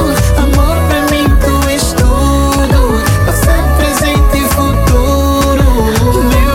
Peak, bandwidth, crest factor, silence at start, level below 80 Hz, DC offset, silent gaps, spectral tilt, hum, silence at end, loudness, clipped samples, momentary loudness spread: 0 dBFS; 17 kHz; 8 dB; 0 s; -12 dBFS; under 0.1%; none; -5.5 dB/octave; none; 0 s; -10 LUFS; under 0.1%; 1 LU